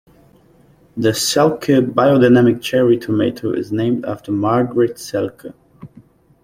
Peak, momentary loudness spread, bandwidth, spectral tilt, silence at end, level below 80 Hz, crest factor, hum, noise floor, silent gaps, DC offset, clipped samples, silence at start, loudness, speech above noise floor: -2 dBFS; 11 LU; 16 kHz; -5.5 dB/octave; 0.6 s; -52 dBFS; 16 dB; none; -50 dBFS; none; under 0.1%; under 0.1%; 0.95 s; -16 LUFS; 35 dB